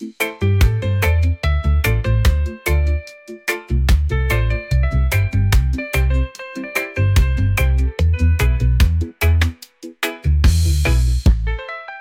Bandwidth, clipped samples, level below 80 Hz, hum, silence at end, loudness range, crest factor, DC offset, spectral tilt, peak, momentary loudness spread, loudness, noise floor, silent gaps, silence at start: 17 kHz; under 0.1%; -20 dBFS; none; 0 s; 1 LU; 12 dB; under 0.1%; -5.5 dB/octave; -4 dBFS; 8 LU; -18 LUFS; -38 dBFS; none; 0 s